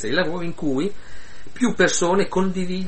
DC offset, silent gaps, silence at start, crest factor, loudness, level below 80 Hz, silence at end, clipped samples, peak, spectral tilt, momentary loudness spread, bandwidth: 5%; none; 0 s; 18 dB; -22 LUFS; -48 dBFS; 0 s; under 0.1%; -4 dBFS; -4.5 dB/octave; 8 LU; 8.8 kHz